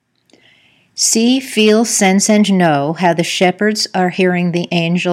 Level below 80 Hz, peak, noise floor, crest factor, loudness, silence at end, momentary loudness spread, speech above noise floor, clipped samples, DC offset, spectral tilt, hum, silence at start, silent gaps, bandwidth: -66 dBFS; 0 dBFS; -52 dBFS; 14 dB; -13 LUFS; 0 s; 5 LU; 39 dB; under 0.1%; under 0.1%; -4 dB/octave; none; 0.95 s; none; 16 kHz